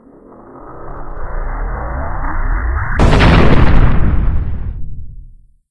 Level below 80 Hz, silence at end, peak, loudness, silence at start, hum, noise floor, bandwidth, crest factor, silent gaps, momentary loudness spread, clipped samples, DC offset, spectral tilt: -16 dBFS; 0 s; 0 dBFS; -15 LUFS; 0 s; none; -39 dBFS; 8.6 kHz; 12 dB; none; 23 LU; 0.2%; under 0.1%; -7.5 dB/octave